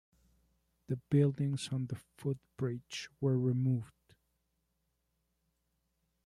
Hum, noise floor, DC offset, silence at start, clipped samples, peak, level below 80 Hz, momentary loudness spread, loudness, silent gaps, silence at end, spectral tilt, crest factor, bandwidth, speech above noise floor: 60 Hz at -65 dBFS; -81 dBFS; under 0.1%; 0.9 s; under 0.1%; -18 dBFS; -70 dBFS; 12 LU; -35 LUFS; none; 2.4 s; -7.5 dB/octave; 20 dB; 11.5 kHz; 47 dB